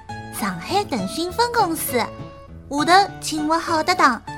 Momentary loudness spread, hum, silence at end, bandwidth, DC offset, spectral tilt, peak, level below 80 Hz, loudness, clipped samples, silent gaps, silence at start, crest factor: 13 LU; none; 0 s; 17.5 kHz; under 0.1%; -3.5 dB/octave; 0 dBFS; -48 dBFS; -20 LUFS; under 0.1%; none; 0 s; 20 dB